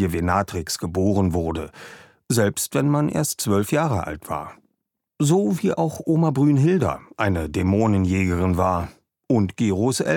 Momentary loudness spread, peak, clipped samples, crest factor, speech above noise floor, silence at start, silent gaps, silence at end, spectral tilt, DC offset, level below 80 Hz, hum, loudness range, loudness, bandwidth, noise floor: 10 LU; -6 dBFS; under 0.1%; 16 dB; 56 dB; 0 s; none; 0 s; -6 dB/octave; under 0.1%; -44 dBFS; none; 3 LU; -22 LUFS; 18.5 kHz; -77 dBFS